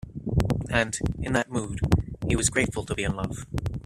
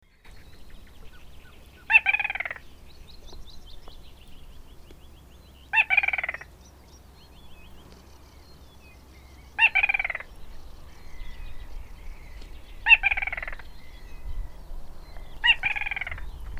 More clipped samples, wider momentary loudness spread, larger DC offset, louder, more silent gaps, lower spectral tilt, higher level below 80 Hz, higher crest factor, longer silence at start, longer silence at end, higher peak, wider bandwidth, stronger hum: neither; second, 8 LU vs 29 LU; neither; second, -27 LUFS vs -22 LUFS; neither; first, -5 dB/octave vs -2.5 dB/octave; first, -36 dBFS vs -42 dBFS; about the same, 22 dB vs 26 dB; second, 0.05 s vs 0.25 s; about the same, 0.05 s vs 0 s; about the same, -6 dBFS vs -4 dBFS; second, 14.5 kHz vs 16 kHz; neither